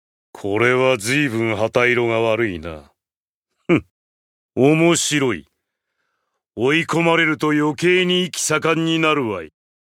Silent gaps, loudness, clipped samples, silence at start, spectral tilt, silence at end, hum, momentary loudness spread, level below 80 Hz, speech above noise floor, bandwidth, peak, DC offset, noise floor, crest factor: 3.17-3.43 s, 3.91-4.49 s; -18 LUFS; under 0.1%; 0.35 s; -4.5 dB/octave; 0.35 s; none; 13 LU; -58 dBFS; over 72 dB; 16 kHz; -2 dBFS; under 0.1%; under -90 dBFS; 16 dB